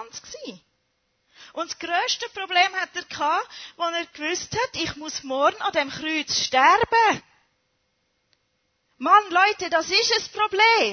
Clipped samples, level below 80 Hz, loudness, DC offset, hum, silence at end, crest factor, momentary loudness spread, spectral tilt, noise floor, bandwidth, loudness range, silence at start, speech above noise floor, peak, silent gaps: under 0.1%; -60 dBFS; -22 LUFS; under 0.1%; none; 0 s; 20 dB; 15 LU; -1.5 dB/octave; -72 dBFS; 6.6 kHz; 4 LU; 0 s; 49 dB; -4 dBFS; none